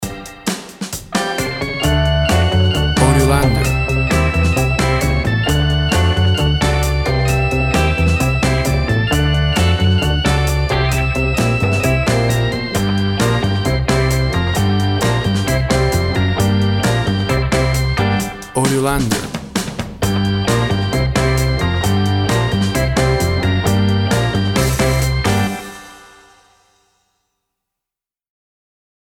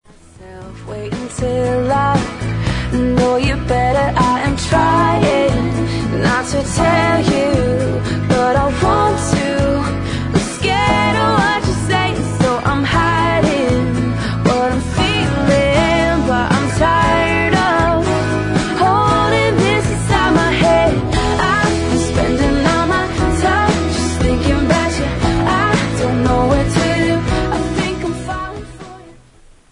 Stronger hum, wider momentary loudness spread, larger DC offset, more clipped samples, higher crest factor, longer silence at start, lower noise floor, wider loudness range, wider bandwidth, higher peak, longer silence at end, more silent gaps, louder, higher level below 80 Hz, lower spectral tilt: neither; about the same, 5 LU vs 6 LU; neither; neither; about the same, 16 dB vs 14 dB; second, 0 s vs 0.4 s; first, -87 dBFS vs -45 dBFS; about the same, 3 LU vs 2 LU; first, 17.5 kHz vs 11 kHz; about the same, 0 dBFS vs 0 dBFS; first, 3.15 s vs 0.6 s; neither; about the same, -16 LUFS vs -15 LUFS; about the same, -24 dBFS vs -28 dBFS; about the same, -5.5 dB/octave vs -5.5 dB/octave